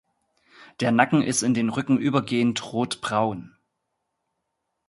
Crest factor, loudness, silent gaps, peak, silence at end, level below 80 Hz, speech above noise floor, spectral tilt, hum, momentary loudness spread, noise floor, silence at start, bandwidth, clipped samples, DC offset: 24 dB; -23 LUFS; none; -2 dBFS; 1.4 s; -64 dBFS; 56 dB; -4.5 dB/octave; none; 8 LU; -79 dBFS; 0.6 s; 11.5 kHz; under 0.1%; under 0.1%